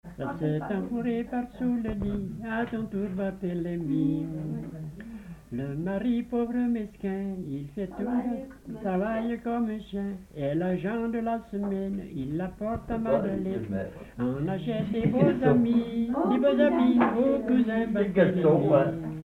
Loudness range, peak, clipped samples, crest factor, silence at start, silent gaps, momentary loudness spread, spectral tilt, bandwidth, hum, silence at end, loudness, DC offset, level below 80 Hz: 8 LU; -8 dBFS; under 0.1%; 18 dB; 0.05 s; none; 12 LU; -9 dB/octave; 4.5 kHz; none; 0 s; -28 LUFS; under 0.1%; -50 dBFS